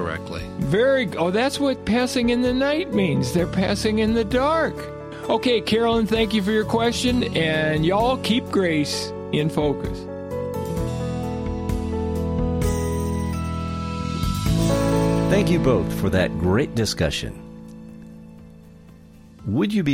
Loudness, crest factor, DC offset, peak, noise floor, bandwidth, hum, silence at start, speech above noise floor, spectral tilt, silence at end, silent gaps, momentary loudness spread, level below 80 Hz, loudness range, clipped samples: -22 LUFS; 16 dB; under 0.1%; -6 dBFS; -46 dBFS; 16.5 kHz; none; 0 s; 25 dB; -6 dB/octave; 0 s; none; 9 LU; -36 dBFS; 5 LU; under 0.1%